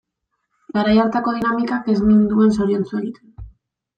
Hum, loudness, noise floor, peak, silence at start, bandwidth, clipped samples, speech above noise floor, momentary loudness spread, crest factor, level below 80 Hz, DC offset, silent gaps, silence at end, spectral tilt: none; -18 LUFS; -75 dBFS; -4 dBFS; 0.75 s; 8.8 kHz; under 0.1%; 58 dB; 11 LU; 14 dB; -44 dBFS; under 0.1%; none; 0.5 s; -8 dB/octave